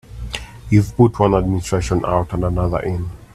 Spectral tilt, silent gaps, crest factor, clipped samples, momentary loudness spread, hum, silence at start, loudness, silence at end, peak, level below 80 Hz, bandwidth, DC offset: -7 dB/octave; none; 18 dB; under 0.1%; 15 LU; none; 0.1 s; -18 LUFS; 0.1 s; 0 dBFS; -32 dBFS; 13.5 kHz; under 0.1%